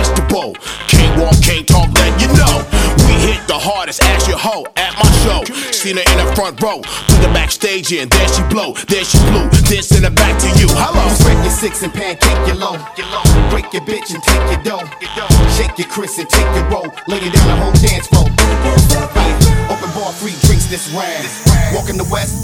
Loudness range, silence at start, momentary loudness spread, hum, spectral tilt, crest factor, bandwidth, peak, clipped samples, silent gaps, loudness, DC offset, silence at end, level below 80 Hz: 4 LU; 0 s; 9 LU; none; -4.5 dB/octave; 12 dB; 17 kHz; 0 dBFS; under 0.1%; none; -12 LUFS; under 0.1%; 0 s; -16 dBFS